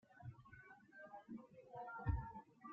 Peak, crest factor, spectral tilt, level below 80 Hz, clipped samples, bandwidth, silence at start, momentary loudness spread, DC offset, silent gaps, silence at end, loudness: -28 dBFS; 22 dB; -8.5 dB/octave; -56 dBFS; under 0.1%; 5.2 kHz; 0.1 s; 17 LU; under 0.1%; none; 0 s; -51 LUFS